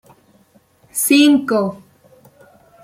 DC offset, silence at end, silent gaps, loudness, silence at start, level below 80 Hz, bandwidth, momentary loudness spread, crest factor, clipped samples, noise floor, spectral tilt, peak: under 0.1%; 1.05 s; none; -15 LUFS; 0.95 s; -64 dBFS; 16 kHz; 14 LU; 18 dB; under 0.1%; -54 dBFS; -3 dB/octave; -2 dBFS